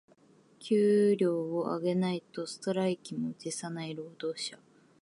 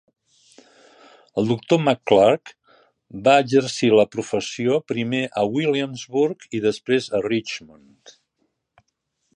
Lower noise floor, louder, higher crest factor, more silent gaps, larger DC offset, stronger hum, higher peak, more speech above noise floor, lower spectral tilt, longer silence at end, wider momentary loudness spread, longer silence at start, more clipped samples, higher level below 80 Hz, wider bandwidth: second, -62 dBFS vs -74 dBFS; second, -31 LUFS vs -21 LUFS; about the same, 16 dB vs 20 dB; neither; neither; neither; second, -16 dBFS vs -2 dBFS; second, 32 dB vs 54 dB; about the same, -6 dB/octave vs -5.5 dB/octave; second, 0.45 s vs 1.7 s; first, 13 LU vs 10 LU; second, 0.6 s vs 1.35 s; neither; second, -80 dBFS vs -62 dBFS; about the same, 11.5 kHz vs 10.5 kHz